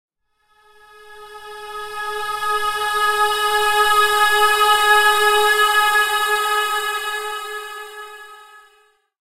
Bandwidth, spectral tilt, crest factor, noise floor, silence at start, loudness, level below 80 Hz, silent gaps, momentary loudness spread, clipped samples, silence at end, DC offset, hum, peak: 16 kHz; 1 dB/octave; 16 dB; -63 dBFS; 1.05 s; -16 LUFS; -52 dBFS; none; 19 LU; under 0.1%; 0.75 s; under 0.1%; none; -2 dBFS